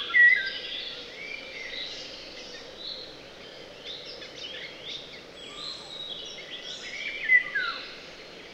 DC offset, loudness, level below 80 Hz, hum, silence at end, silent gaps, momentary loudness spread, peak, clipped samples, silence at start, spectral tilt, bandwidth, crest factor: under 0.1%; -28 LUFS; -62 dBFS; none; 0 s; none; 21 LU; -10 dBFS; under 0.1%; 0 s; -1 dB/octave; 10 kHz; 20 dB